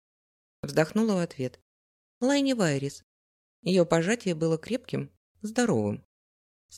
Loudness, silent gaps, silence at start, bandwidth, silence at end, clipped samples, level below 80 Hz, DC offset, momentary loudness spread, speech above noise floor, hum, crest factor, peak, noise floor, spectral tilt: -28 LUFS; 1.62-2.21 s, 3.03-3.63 s, 5.17-5.35 s, 6.05-6.69 s; 0.65 s; 15 kHz; 0 s; under 0.1%; -66 dBFS; under 0.1%; 13 LU; over 64 dB; none; 20 dB; -8 dBFS; under -90 dBFS; -5.5 dB/octave